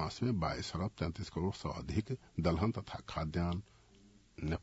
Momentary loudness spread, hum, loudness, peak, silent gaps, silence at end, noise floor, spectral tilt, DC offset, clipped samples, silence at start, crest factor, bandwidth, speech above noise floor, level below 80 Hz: 8 LU; none; -38 LUFS; -18 dBFS; none; 0 s; -63 dBFS; -6 dB/octave; under 0.1%; under 0.1%; 0 s; 20 dB; 7.6 kHz; 26 dB; -54 dBFS